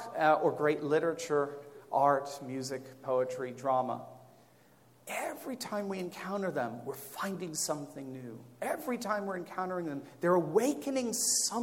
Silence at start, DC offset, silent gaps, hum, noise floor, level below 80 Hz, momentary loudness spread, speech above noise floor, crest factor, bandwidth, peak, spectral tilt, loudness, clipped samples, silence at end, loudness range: 0 s; under 0.1%; none; none; -62 dBFS; -82 dBFS; 13 LU; 30 dB; 20 dB; 16.5 kHz; -14 dBFS; -3.5 dB/octave; -33 LUFS; under 0.1%; 0 s; 6 LU